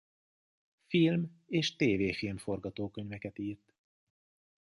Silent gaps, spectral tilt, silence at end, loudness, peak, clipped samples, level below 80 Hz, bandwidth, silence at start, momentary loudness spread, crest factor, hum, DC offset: none; -6 dB/octave; 1.1 s; -33 LUFS; -16 dBFS; under 0.1%; -62 dBFS; 11.5 kHz; 0.9 s; 13 LU; 18 dB; none; under 0.1%